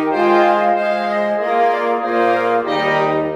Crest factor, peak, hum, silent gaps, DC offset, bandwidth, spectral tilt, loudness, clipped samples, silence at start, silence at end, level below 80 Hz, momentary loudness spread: 14 dB; -2 dBFS; none; none; under 0.1%; 10.5 kHz; -6 dB/octave; -16 LUFS; under 0.1%; 0 s; 0 s; -60 dBFS; 5 LU